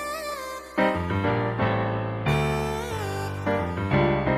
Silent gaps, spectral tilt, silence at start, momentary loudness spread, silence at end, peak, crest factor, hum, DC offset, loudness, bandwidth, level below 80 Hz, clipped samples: none; -6.5 dB/octave; 0 s; 8 LU; 0 s; -10 dBFS; 16 dB; none; under 0.1%; -26 LUFS; 15.5 kHz; -42 dBFS; under 0.1%